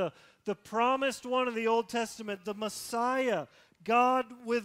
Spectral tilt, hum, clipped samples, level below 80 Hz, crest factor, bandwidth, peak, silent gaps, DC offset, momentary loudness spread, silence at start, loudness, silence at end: -3.5 dB/octave; none; under 0.1%; -74 dBFS; 16 dB; 16 kHz; -14 dBFS; none; under 0.1%; 12 LU; 0 s; -31 LUFS; 0 s